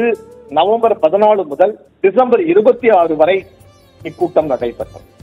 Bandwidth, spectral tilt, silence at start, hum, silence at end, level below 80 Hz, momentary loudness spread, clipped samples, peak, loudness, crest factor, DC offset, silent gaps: 10 kHz; -7 dB/octave; 0 s; none; 0.25 s; -50 dBFS; 13 LU; 0.1%; 0 dBFS; -13 LUFS; 14 dB; under 0.1%; none